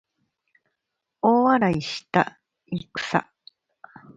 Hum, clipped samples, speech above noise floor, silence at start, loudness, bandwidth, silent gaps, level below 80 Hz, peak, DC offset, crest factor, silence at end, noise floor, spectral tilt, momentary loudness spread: none; under 0.1%; 57 dB; 1.25 s; -23 LUFS; 9 kHz; none; -62 dBFS; -4 dBFS; under 0.1%; 22 dB; 0.95 s; -82 dBFS; -6 dB/octave; 13 LU